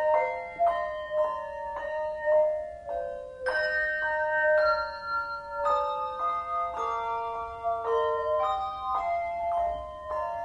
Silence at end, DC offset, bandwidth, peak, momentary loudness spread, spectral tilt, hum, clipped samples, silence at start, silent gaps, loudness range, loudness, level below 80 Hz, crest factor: 0 s; under 0.1%; 9.4 kHz; -12 dBFS; 10 LU; -4 dB/octave; none; under 0.1%; 0 s; none; 3 LU; -29 LUFS; -56 dBFS; 16 dB